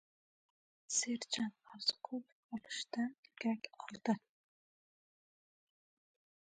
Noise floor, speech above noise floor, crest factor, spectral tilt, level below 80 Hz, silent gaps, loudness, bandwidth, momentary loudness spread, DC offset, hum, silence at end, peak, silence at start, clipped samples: under -90 dBFS; over 49 dB; 24 dB; -2.5 dB/octave; -88 dBFS; 2.32-2.49 s, 3.18-3.23 s; -40 LUFS; 9.4 kHz; 10 LU; under 0.1%; none; 2.3 s; -20 dBFS; 0.9 s; under 0.1%